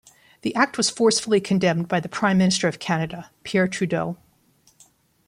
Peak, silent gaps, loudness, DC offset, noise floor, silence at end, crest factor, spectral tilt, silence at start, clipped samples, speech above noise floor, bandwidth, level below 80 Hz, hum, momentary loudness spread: -2 dBFS; none; -22 LUFS; under 0.1%; -60 dBFS; 1.15 s; 20 dB; -4.5 dB/octave; 0.45 s; under 0.1%; 39 dB; 11.5 kHz; -60 dBFS; none; 12 LU